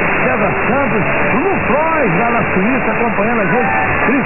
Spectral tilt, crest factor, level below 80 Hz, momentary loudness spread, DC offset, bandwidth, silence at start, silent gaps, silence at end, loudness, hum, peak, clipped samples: -11 dB/octave; 12 dB; -36 dBFS; 1 LU; under 0.1%; 3 kHz; 0 s; none; 0 s; -14 LUFS; none; -2 dBFS; under 0.1%